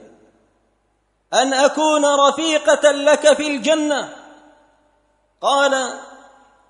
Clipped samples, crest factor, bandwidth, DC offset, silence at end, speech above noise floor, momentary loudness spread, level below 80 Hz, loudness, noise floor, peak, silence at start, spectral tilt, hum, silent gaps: under 0.1%; 18 dB; 10.5 kHz; under 0.1%; 0.6 s; 49 dB; 10 LU; -68 dBFS; -16 LUFS; -65 dBFS; 0 dBFS; 1.3 s; -1 dB/octave; none; none